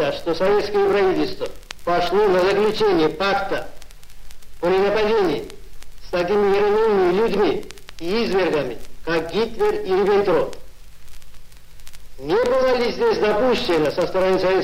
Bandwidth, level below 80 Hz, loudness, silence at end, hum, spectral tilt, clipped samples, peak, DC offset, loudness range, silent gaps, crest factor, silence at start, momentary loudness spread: 16 kHz; -42 dBFS; -19 LUFS; 0 s; none; -5.5 dB/octave; under 0.1%; -4 dBFS; under 0.1%; 3 LU; none; 16 dB; 0 s; 11 LU